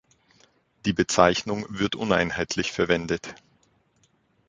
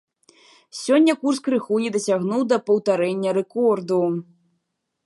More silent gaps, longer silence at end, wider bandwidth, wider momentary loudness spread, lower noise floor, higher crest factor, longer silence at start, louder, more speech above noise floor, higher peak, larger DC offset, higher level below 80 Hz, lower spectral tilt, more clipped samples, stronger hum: neither; first, 1.15 s vs 0.85 s; second, 9.6 kHz vs 11.5 kHz; first, 11 LU vs 6 LU; second, -66 dBFS vs -76 dBFS; first, 24 dB vs 16 dB; about the same, 0.85 s vs 0.75 s; second, -24 LUFS vs -21 LUFS; second, 42 dB vs 55 dB; first, -2 dBFS vs -6 dBFS; neither; first, -50 dBFS vs -76 dBFS; second, -4 dB/octave vs -5.5 dB/octave; neither; neither